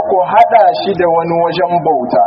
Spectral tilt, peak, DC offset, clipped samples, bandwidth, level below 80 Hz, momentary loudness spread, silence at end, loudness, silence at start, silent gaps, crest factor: -4 dB/octave; 0 dBFS; under 0.1%; 0.3%; 5.8 kHz; -52 dBFS; 5 LU; 0 s; -11 LUFS; 0 s; none; 10 dB